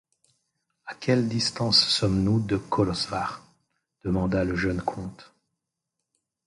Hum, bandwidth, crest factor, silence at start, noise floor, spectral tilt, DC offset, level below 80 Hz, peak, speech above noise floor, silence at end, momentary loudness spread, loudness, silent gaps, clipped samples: none; 11.5 kHz; 20 dB; 0.85 s; -84 dBFS; -5 dB/octave; under 0.1%; -46 dBFS; -8 dBFS; 59 dB; 1.25 s; 18 LU; -25 LUFS; none; under 0.1%